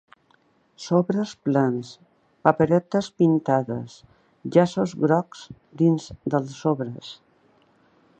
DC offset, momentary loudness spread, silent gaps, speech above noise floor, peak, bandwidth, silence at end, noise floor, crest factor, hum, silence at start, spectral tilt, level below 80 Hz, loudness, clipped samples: under 0.1%; 18 LU; none; 40 dB; -2 dBFS; 8.8 kHz; 1.05 s; -62 dBFS; 22 dB; none; 0.8 s; -7.5 dB/octave; -62 dBFS; -23 LUFS; under 0.1%